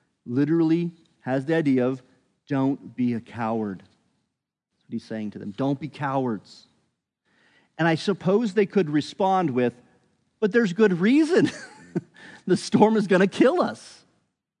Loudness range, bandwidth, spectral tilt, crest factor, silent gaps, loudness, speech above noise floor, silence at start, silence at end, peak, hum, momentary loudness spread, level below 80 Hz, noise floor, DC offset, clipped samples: 9 LU; 10.5 kHz; -7 dB/octave; 22 dB; none; -24 LUFS; 58 dB; 0.25 s; 0.7 s; -4 dBFS; none; 14 LU; -76 dBFS; -81 dBFS; under 0.1%; under 0.1%